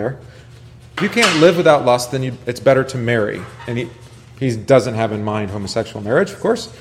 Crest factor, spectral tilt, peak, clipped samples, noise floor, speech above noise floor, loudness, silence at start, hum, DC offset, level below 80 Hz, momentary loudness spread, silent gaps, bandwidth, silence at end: 18 dB; -5 dB/octave; 0 dBFS; under 0.1%; -36 dBFS; 20 dB; -17 LUFS; 0 s; none; under 0.1%; -50 dBFS; 14 LU; none; 15.5 kHz; 0 s